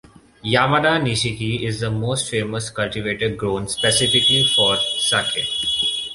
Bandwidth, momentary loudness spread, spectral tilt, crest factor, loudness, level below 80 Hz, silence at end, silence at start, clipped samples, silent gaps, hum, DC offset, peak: 11.5 kHz; 10 LU; -3 dB/octave; 18 dB; -18 LUFS; -48 dBFS; 0 s; 0.45 s; under 0.1%; none; none; under 0.1%; -2 dBFS